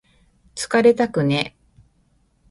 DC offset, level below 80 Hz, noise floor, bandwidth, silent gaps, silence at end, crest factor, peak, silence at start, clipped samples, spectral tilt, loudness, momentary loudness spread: under 0.1%; -56 dBFS; -62 dBFS; 11.5 kHz; none; 1.05 s; 18 dB; -2 dBFS; 0.55 s; under 0.1%; -5.5 dB/octave; -19 LUFS; 14 LU